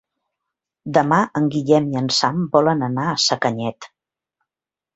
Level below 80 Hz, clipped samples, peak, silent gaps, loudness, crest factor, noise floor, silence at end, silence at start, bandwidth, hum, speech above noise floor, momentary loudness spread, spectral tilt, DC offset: -60 dBFS; under 0.1%; -2 dBFS; none; -19 LUFS; 18 dB; -89 dBFS; 1.1 s; 0.85 s; 8.2 kHz; none; 71 dB; 5 LU; -5 dB/octave; under 0.1%